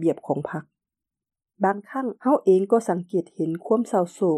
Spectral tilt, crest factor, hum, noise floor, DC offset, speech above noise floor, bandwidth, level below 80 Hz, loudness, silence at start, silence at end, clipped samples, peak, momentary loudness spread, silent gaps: -8 dB/octave; 18 dB; none; -88 dBFS; under 0.1%; 65 dB; 12 kHz; -74 dBFS; -24 LUFS; 0 s; 0 s; under 0.1%; -6 dBFS; 10 LU; none